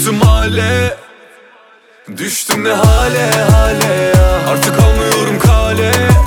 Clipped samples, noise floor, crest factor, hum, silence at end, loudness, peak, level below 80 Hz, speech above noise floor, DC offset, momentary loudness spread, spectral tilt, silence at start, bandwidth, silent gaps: under 0.1%; -44 dBFS; 10 dB; none; 0 s; -11 LUFS; 0 dBFS; -16 dBFS; 34 dB; under 0.1%; 7 LU; -5 dB/octave; 0 s; 20 kHz; none